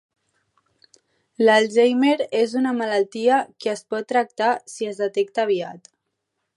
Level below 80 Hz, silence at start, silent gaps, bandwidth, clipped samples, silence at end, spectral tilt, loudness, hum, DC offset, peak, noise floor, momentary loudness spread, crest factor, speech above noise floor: -78 dBFS; 1.4 s; none; 11.5 kHz; under 0.1%; 0.8 s; -4 dB/octave; -21 LUFS; none; under 0.1%; -4 dBFS; -77 dBFS; 10 LU; 18 dB; 57 dB